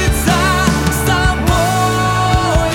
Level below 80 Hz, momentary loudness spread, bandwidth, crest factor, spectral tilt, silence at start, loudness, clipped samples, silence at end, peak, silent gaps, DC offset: -22 dBFS; 1 LU; 19 kHz; 12 dB; -4.5 dB/octave; 0 s; -13 LUFS; under 0.1%; 0 s; 0 dBFS; none; under 0.1%